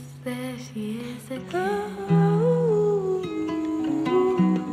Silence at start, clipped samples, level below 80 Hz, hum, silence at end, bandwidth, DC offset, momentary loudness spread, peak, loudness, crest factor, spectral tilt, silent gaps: 0 s; under 0.1%; -60 dBFS; none; 0 s; 13 kHz; under 0.1%; 13 LU; -10 dBFS; -25 LUFS; 14 dB; -8 dB/octave; none